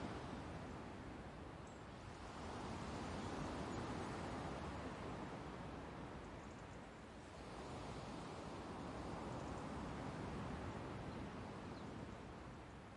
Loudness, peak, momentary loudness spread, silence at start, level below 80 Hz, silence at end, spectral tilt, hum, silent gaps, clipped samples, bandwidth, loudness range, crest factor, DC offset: -50 LUFS; -36 dBFS; 8 LU; 0 s; -62 dBFS; 0 s; -6 dB/octave; none; none; under 0.1%; 11.5 kHz; 4 LU; 14 dB; under 0.1%